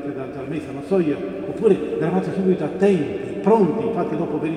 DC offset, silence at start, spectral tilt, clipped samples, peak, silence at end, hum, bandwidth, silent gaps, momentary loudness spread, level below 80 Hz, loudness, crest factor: under 0.1%; 0 s; -8.5 dB/octave; under 0.1%; -4 dBFS; 0 s; none; 10 kHz; none; 11 LU; -56 dBFS; -21 LUFS; 16 dB